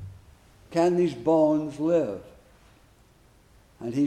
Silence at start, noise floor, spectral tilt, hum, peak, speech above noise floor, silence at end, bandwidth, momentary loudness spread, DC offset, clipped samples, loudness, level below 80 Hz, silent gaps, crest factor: 0 s; -58 dBFS; -7.5 dB/octave; none; -10 dBFS; 34 dB; 0 s; 11.5 kHz; 17 LU; under 0.1%; under 0.1%; -25 LUFS; -60 dBFS; none; 16 dB